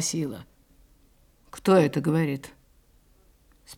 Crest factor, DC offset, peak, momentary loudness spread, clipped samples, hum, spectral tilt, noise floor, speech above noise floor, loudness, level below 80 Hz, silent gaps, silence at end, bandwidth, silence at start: 20 dB; under 0.1%; -8 dBFS; 24 LU; under 0.1%; none; -5.5 dB/octave; -60 dBFS; 36 dB; -25 LUFS; -60 dBFS; none; 0 s; 17 kHz; 0 s